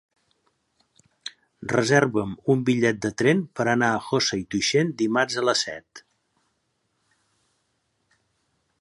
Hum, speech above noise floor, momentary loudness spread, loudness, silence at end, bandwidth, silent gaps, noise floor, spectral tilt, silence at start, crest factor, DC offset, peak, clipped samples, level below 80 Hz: none; 50 dB; 17 LU; -23 LUFS; 2.8 s; 11.5 kHz; none; -73 dBFS; -4.5 dB/octave; 1.25 s; 22 dB; under 0.1%; -4 dBFS; under 0.1%; -62 dBFS